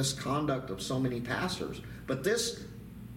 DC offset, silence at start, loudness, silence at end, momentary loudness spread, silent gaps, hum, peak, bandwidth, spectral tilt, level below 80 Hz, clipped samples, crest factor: under 0.1%; 0 s; -33 LUFS; 0 s; 13 LU; none; none; -18 dBFS; 17 kHz; -4.5 dB/octave; -54 dBFS; under 0.1%; 16 dB